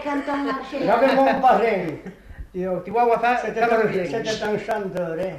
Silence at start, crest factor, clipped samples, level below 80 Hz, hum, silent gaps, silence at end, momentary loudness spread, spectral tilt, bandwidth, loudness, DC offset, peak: 0 s; 16 dB; under 0.1%; -48 dBFS; none; none; 0 s; 11 LU; -5.5 dB/octave; 14 kHz; -21 LUFS; under 0.1%; -6 dBFS